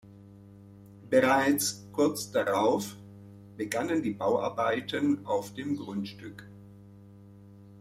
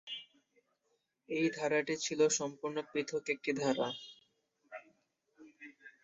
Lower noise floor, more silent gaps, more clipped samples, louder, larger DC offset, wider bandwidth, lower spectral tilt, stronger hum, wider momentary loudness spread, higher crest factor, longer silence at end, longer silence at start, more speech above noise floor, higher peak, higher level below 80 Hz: second, -51 dBFS vs -81 dBFS; neither; neither; first, -29 LUFS vs -35 LUFS; neither; first, 16 kHz vs 7.6 kHz; first, -4.5 dB/octave vs -3 dB/octave; neither; about the same, 22 LU vs 22 LU; about the same, 20 dB vs 20 dB; second, 0 s vs 0.15 s; about the same, 0.05 s vs 0.05 s; second, 23 dB vs 46 dB; first, -10 dBFS vs -18 dBFS; first, -70 dBFS vs -82 dBFS